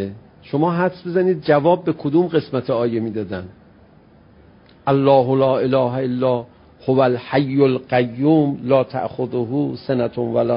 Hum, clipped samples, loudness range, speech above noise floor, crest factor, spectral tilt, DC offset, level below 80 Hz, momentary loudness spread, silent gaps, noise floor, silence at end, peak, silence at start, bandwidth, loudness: none; under 0.1%; 3 LU; 31 dB; 16 dB; -12.5 dB/octave; under 0.1%; -54 dBFS; 9 LU; none; -49 dBFS; 0 s; -2 dBFS; 0 s; 5.4 kHz; -19 LUFS